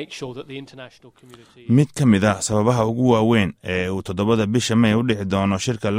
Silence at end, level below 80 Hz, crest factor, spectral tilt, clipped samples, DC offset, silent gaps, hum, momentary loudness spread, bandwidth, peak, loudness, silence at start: 0 s; -50 dBFS; 16 dB; -6 dB/octave; under 0.1%; under 0.1%; none; none; 16 LU; 15 kHz; -4 dBFS; -19 LUFS; 0 s